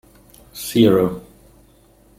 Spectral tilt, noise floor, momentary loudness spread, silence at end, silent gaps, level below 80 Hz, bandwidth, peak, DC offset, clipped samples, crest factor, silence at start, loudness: -6 dB/octave; -52 dBFS; 21 LU; 1 s; none; -50 dBFS; 16.5 kHz; -2 dBFS; under 0.1%; under 0.1%; 18 dB; 0.55 s; -17 LUFS